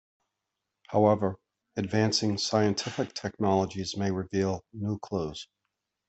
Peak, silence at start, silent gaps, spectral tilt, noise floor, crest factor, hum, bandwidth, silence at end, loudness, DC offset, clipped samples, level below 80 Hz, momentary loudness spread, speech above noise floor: -10 dBFS; 0.9 s; none; -5.5 dB/octave; -85 dBFS; 20 dB; none; 8.4 kHz; 0.65 s; -29 LUFS; under 0.1%; under 0.1%; -64 dBFS; 11 LU; 57 dB